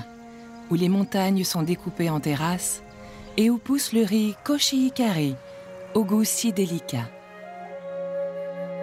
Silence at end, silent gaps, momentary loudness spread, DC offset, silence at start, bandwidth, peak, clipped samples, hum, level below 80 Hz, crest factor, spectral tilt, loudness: 0 s; none; 19 LU; under 0.1%; 0 s; 16 kHz; -8 dBFS; under 0.1%; none; -58 dBFS; 16 dB; -4.5 dB/octave; -24 LUFS